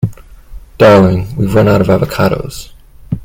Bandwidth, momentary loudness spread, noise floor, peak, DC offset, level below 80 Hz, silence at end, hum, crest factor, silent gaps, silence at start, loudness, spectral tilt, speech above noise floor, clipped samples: 16.5 kHz; 17 LU; -31 dBFS; 0 dBFS; under 0.1%; -32 dBFS; 0 s; none; 12 dB; none; 0 s; -10 LUFS; -7.5 dB/octave; 22 dB; 0.4%